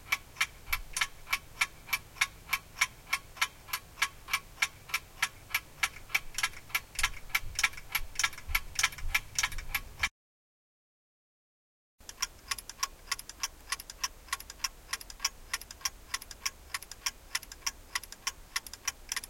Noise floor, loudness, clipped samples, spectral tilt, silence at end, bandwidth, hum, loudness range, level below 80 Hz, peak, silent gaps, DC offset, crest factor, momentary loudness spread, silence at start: under -90 dBFS; -34 LUFS; under 0.1%; 1 dB/octave; 0 s; 17 kHz; none; 7 LU; -48 dBFS; -10 dBFS; 10.11-11.98 s; under 0.1%; 28 dB; 8 LU; 0 s